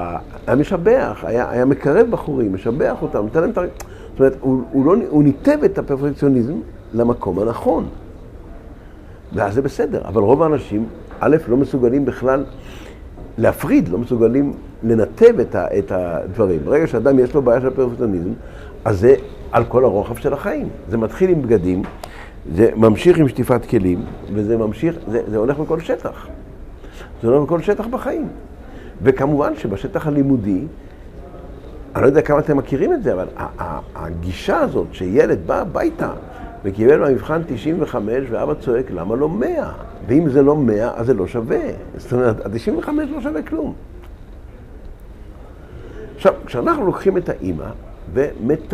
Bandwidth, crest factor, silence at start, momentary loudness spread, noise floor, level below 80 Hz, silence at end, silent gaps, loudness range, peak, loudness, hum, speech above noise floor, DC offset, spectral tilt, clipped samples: 14.5 kHz; 18 dB; 0 s; 17 LU; -37 dBFS; -36 dBFS; 0 s; none; 5 LU; 0 dBFS; -18 LUFS; none; 21 dB; under 0.1%; -8.5 dB/octave; under 0.1%